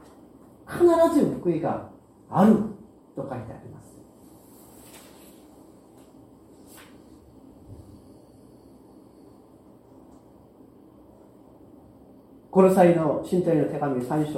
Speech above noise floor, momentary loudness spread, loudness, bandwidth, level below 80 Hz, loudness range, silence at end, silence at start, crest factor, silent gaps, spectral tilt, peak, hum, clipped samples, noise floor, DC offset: 31 dB; 28 LU; -22 LUFS; 15.5 kHz; -60 dBFS; 26 LU; 0 s; 0.7 s; 24 dB; none; -8 dB/octave; -4 dBFS; none; under 0.1%; -52 dBFS; under 0.1%